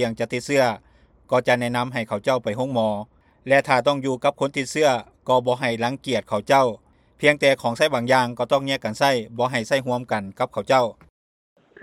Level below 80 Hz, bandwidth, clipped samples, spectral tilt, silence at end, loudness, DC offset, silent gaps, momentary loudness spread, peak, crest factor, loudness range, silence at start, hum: -60 dBFS; 14.5 kHz; under 0.1%; -4.5 dB/octave; 0.9 s; -22 LUFS; under 0.1%; none; 8 LU; -2 dBFS; 20 dB; 3 LU; 0 s; none